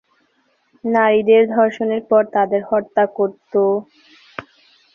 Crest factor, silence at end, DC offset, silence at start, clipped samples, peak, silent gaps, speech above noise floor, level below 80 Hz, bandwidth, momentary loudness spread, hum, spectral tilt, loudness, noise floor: 16 dB; 0.55 s; under 0.1%; 0.85 s; under 0.1%; -2 dBFS; none; 46 dB; -64 dBFS; 6.8 kHz; 18 LU; none; -7.5 dB/octave; -17 LUFS; -63 dBFS